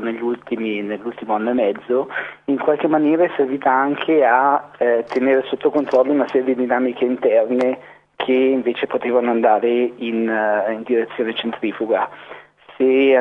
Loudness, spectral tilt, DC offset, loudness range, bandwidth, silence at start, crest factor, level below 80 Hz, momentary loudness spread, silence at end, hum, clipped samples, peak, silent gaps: -18 LUFS; -7 dB/octave; under 0.1%; 3 LU; 5.8 kHz; 0 s; 16 dB; -70 dBFS; 8 LU; 0 s; none; under 0.1%; -2 dBFS; none